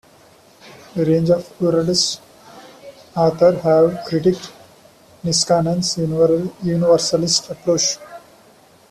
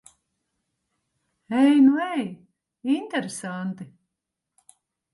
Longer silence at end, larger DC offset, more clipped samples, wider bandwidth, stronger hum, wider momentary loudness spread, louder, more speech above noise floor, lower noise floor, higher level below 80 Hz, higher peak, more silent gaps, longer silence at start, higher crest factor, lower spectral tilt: second, 0.7 s vs 1.3 s; neither; neither; first, 14 kHz vs 11.5 kHz; neither; second, 11 LU vs 18 LU; first, -17 LUFS vs -23 LUFS; second, 33 dB vs 62 dB; second, -49 dBFS vs -84 dBFS; first, -54 dBFS vs -76 dBFS; first, -2 dBFS vs -8 dBFS; neither; second, 0.65 s vs 1.5 s; about the same, 16 dB vs 18 dB; about the same, -4.5 dB/octave vs -5.5 dB/octave